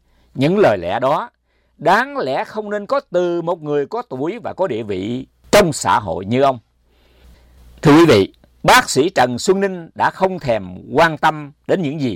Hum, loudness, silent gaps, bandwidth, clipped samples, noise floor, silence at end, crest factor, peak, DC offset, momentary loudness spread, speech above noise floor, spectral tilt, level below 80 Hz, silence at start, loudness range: none; -17 LUFS; none; 19.5 kHz; under 0.1%; -55 dBFS; 0 s; 12 dB; -6 dBFS; under 0.1%; 12 LU; 39 dB; -5 dB/octave; -46 dBFS; 0.35 s; 5 LU